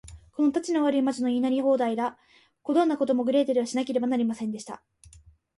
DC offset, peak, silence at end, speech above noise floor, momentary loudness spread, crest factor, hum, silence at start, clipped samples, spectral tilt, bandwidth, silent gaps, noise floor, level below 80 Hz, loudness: under 0.1%; -12 dBFS; 0.8 s; 29 dB; 12 LU; 14 dB; none; 0.05 s; under 0.1%; -5 dB/octave; 11.5 kHz; none; -54 dBFS; -60 dBFS; -26 LUFS